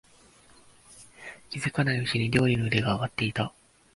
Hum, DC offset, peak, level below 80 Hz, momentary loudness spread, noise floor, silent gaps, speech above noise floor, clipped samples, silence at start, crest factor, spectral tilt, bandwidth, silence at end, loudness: none; under 0.1%; -6 dBFS; -54 dBFS; 17 LU; -57 dBFS; none; 31 dB; under 0.1%; 0.9 s; 22 dB; -6 dB/octave; 11.5 kHz; 0.45 s; -27 LUFS